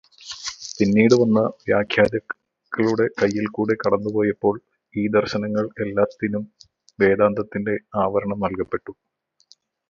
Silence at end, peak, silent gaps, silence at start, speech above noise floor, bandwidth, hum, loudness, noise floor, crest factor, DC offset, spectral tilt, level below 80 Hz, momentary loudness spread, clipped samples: 0.95 s; -2 dBFS; none; 0.2 s; 37 dB; 7.6 kHz; none; -21 LUFS; -57 dBFS; 20 dB; under 0.1%; -6 dB/octave; -54 dBFS; 14 LU; under 0.1%